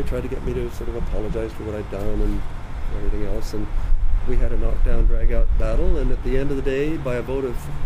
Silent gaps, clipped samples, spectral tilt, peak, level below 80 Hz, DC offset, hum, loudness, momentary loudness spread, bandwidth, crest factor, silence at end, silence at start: none; under 0.1%; -7.5 dB/octave; -6 dBFS; -20 dBFS; under 0.1%; none; -26 LUFS; 6 LU; 6.8 kHz; 12 dB; 0 s; 0 s